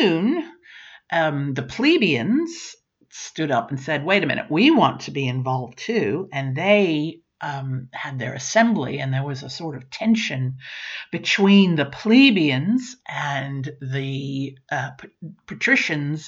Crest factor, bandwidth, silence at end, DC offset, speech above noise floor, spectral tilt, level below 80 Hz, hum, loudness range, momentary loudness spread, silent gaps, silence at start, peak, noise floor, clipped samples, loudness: 18 dB; 7.8 kHz; 0 s; under 0.1%; 25 dB; -5.5 dB/octave; -64 dBFS; none; 5 LU; 16 LU; none; 0 s; -4 dBFS; -46 dBFS; under 0.1%; -21 LUFS